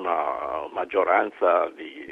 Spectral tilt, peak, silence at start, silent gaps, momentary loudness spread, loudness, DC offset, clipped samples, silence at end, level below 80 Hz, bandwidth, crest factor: -5.5 dB/octave; -6 dBFS; 0 s; none; 9 LU; -24 LUFS; under 0.1%; under 0.1%; 0 s; -64 dBFS; 5.2 kHz; 18 dB